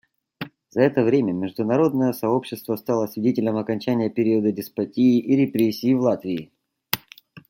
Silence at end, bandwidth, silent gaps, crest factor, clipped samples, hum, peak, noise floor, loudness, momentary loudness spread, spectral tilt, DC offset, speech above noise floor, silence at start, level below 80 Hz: 0.1 s; 17 kHz; none; 22 dB; under 0.1%; none; 0 dBFS; -48 dBFS; -22 LUFS; 10 LU; -7 dB/octave; under 0.1%; 27 dB; 0.4 s; -66 dBFS